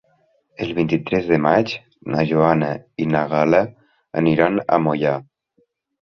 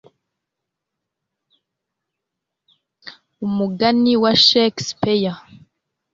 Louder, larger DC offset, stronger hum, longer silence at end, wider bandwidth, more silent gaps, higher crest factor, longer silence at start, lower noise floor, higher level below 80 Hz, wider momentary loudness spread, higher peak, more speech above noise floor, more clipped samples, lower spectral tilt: second, -19 LUFS vs -16 LUFS; neither; neither; first, 0.9 s vs 0.75 s; second, 6.4 kHz vs 7.6 kHz; neither; about the same, 18 dB vs 20 dB; second, 0.6 s vs 3.05 s; second, -65 dBFS vs -82 dBFS; first, -54 dBFS vs -60 dBFS; second, 11 LU vs 14 LU; about the same, -2 dBFS vs -2 dBFS; second, 47 dB vs 65 dB; neither; first, -8 dB/octave vs -4.5 dB/octave